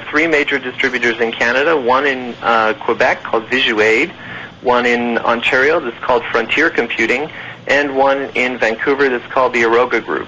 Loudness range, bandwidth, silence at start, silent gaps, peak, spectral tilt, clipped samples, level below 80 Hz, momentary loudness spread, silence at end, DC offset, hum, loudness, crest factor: 1 LU; 8 kHz; 0 s; none; -2 dBFS; -4 dB/octave; under 0.1%; -50 dBFS; 5 LU; 0 s; under 0.1%; none; -14 LUFS; 14 dB